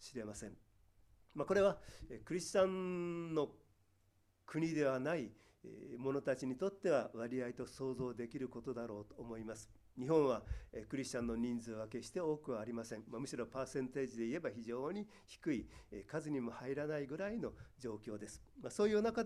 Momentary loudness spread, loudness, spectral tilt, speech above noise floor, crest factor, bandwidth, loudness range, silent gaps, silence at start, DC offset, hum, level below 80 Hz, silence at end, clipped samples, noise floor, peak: 15 LU; -41 LUFS; -6 dB/octave; 34 dB; 20 dB; 13.5 kHz; 4 LU; none; 0 s; under 0.1%; none; -64 dBFS; 0 s; under 0.1%; -75 dBFS; -20 dBFS